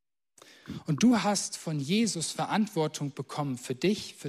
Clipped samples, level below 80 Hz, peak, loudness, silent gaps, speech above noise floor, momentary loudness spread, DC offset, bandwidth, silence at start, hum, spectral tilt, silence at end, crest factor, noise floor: under 0.1%; -70 dBFS; -14 dBFS; -29 LUFS; none; 30 dB; 11 LU; under 0.1%; 14.5 kHz; 0.65 s; none; -4.5 dB/octave; 0 s; 16 dB; -59 dBFS